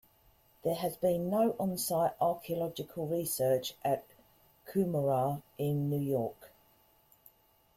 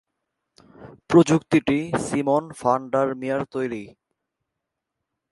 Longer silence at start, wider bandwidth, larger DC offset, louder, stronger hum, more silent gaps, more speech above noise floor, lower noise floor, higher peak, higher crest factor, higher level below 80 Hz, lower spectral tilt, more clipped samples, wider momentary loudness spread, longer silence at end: second, 0.65 s vs 0.8 s; first, 16.5 kHz vs 11.5 kHz; neither; second, -33 LUFS vs -22 LUFS; neither; neither; second, 35 dB vs 61 dB; second, -67 dBFS vs -83 dBFS; second, -18 dBFS vs -2 dBFS; second, 16 dB vs 22 dB; second, -68 dBFS vs -58 dBFS; about the same, -6 dB/octave vs -6.5 dB/octave; neither; second, 6 LU vs 11 LU; second, 1.3 s vs 1.45 s